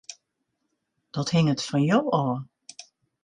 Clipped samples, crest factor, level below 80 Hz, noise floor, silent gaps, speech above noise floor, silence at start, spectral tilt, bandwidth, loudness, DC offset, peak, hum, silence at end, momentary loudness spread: under 0.1%; 18 dB; -64 dBFS; -78 dBFS; none; 55 dB; 0.1 s; -6 dB/octave; 10.5 kHz; -24 LUFS; under 0.1%; -8 dBFS; none; 0.4 s; 22 LU